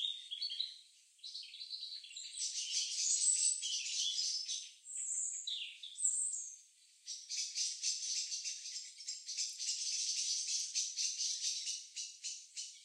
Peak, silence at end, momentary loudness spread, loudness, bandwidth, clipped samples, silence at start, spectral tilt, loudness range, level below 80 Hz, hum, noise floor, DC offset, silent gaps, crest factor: -20 dBFS; 0 s; 13 LU; -37 LUFS; 15.5 kHz; under 0.1%; 0 s; 11.5 dB/octave; 4 LU; under -90 dBFS; none; -64 dBFS; under 0.1%; none; 20 dB